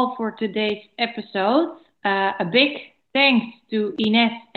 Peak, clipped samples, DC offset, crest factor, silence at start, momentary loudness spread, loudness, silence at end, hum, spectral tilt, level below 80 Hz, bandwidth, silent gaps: -2 dBFS; under 0.1%; under 0.1%; 20 dB; 0 s; 9 LU; -21 LUFS; 0.15 s; none; -7.5 dB/octave; -72 dBFS; 4.9 kHz; none